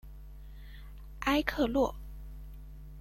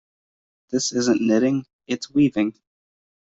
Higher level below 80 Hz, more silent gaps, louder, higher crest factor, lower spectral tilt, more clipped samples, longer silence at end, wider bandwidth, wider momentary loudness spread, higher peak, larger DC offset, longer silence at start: first, -46 dBFS vs -62 dBFS; second, none vs 1.73-1.79 s; second, -31 LUFS vs -22 LUFS; first, 24 dB vs 16 dB; about the same, -5.5 dB/octave vs -4.5 dB/octave; neither; second, 0 s vs 0.8 s; first, 16.5 kHz vs 8 kHz; first, 22 LU vs 9 LU; second, -12 dBFS vs -8 dBFS; neither; second, 0.05 s vs 0.7 s